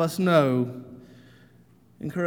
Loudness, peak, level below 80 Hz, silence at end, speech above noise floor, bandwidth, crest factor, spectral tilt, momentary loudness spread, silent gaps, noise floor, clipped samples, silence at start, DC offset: -23 LUFS; -8 dBFS; -66 dBFS; 0 s; 33 dB; 18.5 kHz; 18 dB; -7 dB/octave; 21 LU; none; -56 dBFS; under 0.1%; 0 s; under 0.1%